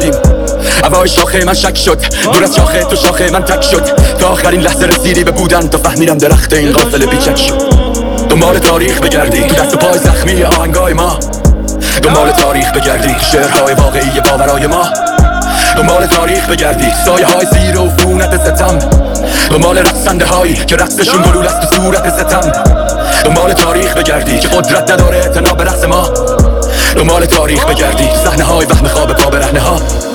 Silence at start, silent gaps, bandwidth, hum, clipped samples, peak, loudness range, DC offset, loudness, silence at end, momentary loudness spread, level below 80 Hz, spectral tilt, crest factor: 0 s; none; over 20 kHz; none; under 0.1%; 0 dBFS; 1 LU; under 0.1%; -8 LUFS; 0 s; 3 LU; -14 dBFS; -4 dB/octave; 8 dB